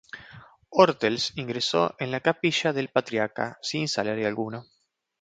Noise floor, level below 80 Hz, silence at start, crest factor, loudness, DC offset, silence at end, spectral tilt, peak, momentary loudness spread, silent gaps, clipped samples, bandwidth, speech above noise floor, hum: -50 dBFS; -66 dBFS; 0.15 s; 24 dB; -26 LUFS; under 0.1%; 0.6 s; -4.5 dB/octave; -2 dBFS; 11 LU; none; under 0.1%; 9.4 kHz; 24 dB; none